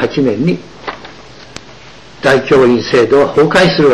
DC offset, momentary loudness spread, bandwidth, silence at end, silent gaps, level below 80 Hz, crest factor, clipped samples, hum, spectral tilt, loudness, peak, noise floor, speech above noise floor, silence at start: 0.8%; 23 LU; 12 kHz; 0 s; none; -42 dBFS; 10 dB; under 0.1%; none; -6 dB/octave; -10 LUFS; -2 dBFS; -36 dBFS; 26 dB; 0 s